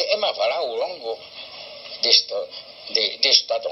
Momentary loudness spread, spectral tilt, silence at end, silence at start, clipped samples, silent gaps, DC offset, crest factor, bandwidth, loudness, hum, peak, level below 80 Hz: 20 LU; 0.5 dB/octave; 0 s; 0 s; under 0.1%; none; under 0.1%; 22 dB; 7.6 kHz; -19 LUFS; none; 0 dBFS; -72 dBFS